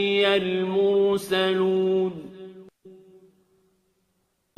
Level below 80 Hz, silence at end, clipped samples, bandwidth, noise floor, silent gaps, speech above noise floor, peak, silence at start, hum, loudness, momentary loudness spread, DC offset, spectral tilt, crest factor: -68 dBFS; 1.65 s; under 0.1%; 14 kHz; -72 dBFS; none; 50 dB; -8 dBFS; 0 s; none; -22 LUFS; 20 LU; under 0.1%; -5.5 dB/octave; 18 dB